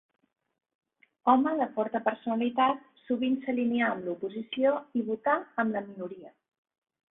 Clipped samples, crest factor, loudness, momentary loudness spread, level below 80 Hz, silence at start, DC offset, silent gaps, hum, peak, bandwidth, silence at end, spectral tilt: under 0.1%; 22 dB; -29 LUFS; 11 LU; -76 dBFS; 1.25 s; under 0.1%; none; none; -8 dBFS; 3.9 kHz; 0.8 s; -9 dB/octave